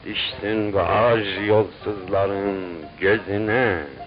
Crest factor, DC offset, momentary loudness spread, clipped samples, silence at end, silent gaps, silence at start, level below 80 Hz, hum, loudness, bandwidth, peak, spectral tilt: 16 dB; under 0.1%; 8 LU; under 0.1%; 0 s; none; 0 s; -46 dBFS; none; -22 LUFS; 5.2 kHz; -6 dBFS; -10.5 dB/octave